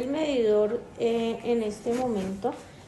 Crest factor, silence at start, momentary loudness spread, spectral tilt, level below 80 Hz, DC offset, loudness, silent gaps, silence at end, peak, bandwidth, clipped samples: 12 dB; 0 s; 7 LU; -6 dB/octave; -56 dBFS; under 0.1%; -27 LUFS; none; 0 s; -14 dBFS; 12 kHz; under 0.1%